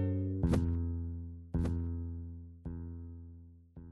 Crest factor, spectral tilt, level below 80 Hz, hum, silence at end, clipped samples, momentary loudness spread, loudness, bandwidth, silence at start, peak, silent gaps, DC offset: 18 dB; -9 dB/octave; -44 dBFS; none; 0 s; under 0.1%; 20 LU; -37 LUFS; 11 kHz; 0 s; -18 dBFS; none; under 0.1%